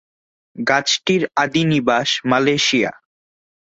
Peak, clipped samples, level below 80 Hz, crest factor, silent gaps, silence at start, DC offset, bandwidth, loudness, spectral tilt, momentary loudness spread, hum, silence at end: -2 dBFS; under 0.1%; -58 dBFS; 18 dB; none; 0.55 s; under 0.1%; 8.2 kHz; -17 LUFS; -4 dB/octave; 4 LU; none; 0.9 s